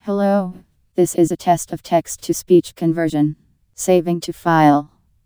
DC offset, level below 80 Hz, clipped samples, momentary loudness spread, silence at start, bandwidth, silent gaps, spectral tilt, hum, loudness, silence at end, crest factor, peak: 0.1%; -56 dBFS; under 0.1%; 9 LU; 0.05 s; over 20 kHz; none; -6 dB/octave; none; -18 LUFS; 0.4 s; 16 dB; -2 dBFS